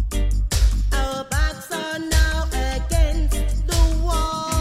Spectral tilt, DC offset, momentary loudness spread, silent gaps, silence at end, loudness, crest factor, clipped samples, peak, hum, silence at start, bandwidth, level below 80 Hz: -4.5 dB/octave; under 0.1%; 4 LU; none; 0 s; -22 LUFS; 14 dB; under 0.1%; -6 dBFS; none; 0 s; 15 kHz; -20 dBFS